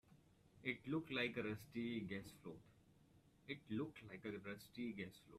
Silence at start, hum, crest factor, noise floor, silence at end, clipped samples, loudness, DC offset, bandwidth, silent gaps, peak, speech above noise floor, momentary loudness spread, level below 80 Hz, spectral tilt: 0.1 s; none; 22 dB; -72 dBFS; 0 s; under 0.1%; -48 LUFS; under 0.1%; 14.5 kHz; none; -28 dBFS; 24 dB; 13 LU; -78 dBFS; -6 dB/octave